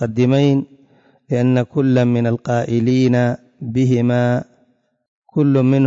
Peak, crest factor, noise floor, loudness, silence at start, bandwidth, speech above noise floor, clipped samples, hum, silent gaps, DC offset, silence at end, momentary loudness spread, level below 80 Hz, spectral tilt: -6 dBFS; 12 dB; -60 dBFS; -17 LUFS; 0 s; 7.6 kHz; 45 dB; under 0.1%; none; 5.08-5.22 s; under 0.1%; 0 s; 9 LU; -56 dBFS; -8.5 dB/octave